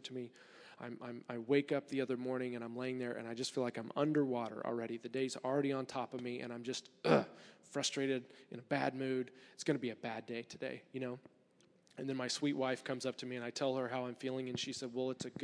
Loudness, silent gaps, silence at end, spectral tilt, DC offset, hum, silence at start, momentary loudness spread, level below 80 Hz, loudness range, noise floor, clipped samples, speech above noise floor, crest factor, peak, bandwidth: -39 LUFS; none; 0 s; -4.5 dB/octave; under 0.1%; none; 0 s; 13 LU; -88 dBFS; 4 LU; -70 dBFS; under 0.1%; 31 dB; 24 dB; -16 dBFS; 11 kHz